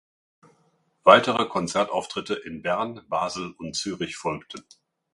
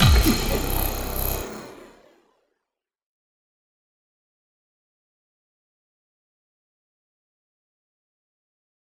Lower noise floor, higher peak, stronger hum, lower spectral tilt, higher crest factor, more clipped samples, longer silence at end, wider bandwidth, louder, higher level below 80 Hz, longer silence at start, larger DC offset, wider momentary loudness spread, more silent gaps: second, -67 dBFS vs -84 dBFS; about the same, 0 dBFS vs -2 dBFS; neither; about the same, -4 dB/octave vs -4.5 dB/octave; about the same, 26 dB vs 26 dB; neither; second, 0.55 s vs 7.15 s; second, 11.5 kHz vs over 20 kHz; about the same, -24 LUFS vs -23 LUFS; second, -62 dBFS vs -32 dBFS; first, 1.05 s vs 0 s; neither; about the same, 16 LU vs 18 LU; neither